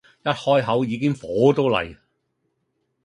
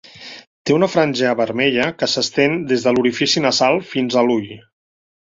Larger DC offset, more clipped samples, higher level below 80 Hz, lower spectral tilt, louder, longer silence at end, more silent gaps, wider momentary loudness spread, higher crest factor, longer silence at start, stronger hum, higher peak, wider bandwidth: neither; neither; about the same, -56 dBFS vs -58 dBFS; first, -7 dB/octave vs -4 dB/octave; second, -21 LUFS vs -17 LUFS; first, 1.1 s vs 0.65 s; second, none vs 0.47-0.65 s; second, 7 LU vs 11 LU; about the same, 20 dB vs 16 dB; about the same, 0.25 s vs 0.15 s; neither; about the same, -4 dBFS vs -2 dBFS; first, 11 kHz vs 7.8 kHz